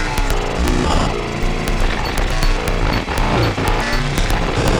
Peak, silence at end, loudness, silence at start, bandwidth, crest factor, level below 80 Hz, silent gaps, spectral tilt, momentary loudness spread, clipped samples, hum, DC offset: -2 dBFS; 0 s; -19 LUFS; 0 s; 17.5 kHz; 14 dB; -20 dBFS; none; -5 dB/octave; 3 LU; under 0.1%; none; under 0.1%